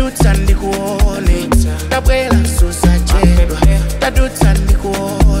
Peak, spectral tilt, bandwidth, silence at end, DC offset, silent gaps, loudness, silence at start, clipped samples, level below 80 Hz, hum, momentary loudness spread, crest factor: 0 dBFS; -5.5 dB/octave; 16 kHz; 0 s; under 0.1%; none; -13 LUFS; 0 s; under 0.1%; -12 dBFS; none; 4 LU; 10 dB